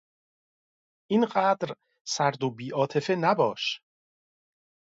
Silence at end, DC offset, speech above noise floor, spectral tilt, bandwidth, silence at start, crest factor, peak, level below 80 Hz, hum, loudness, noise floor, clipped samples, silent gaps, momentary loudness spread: 1.15 s; under 0.1%; over 64 dB; -4.5 dB/octave; 8 kHz; 1.1 s; 20 dB; -10 dBFS; -76 dBFS; none; -27 LUFS; under -90 dBFS; under 0.1%; 2.01-2.05 s; 10 LU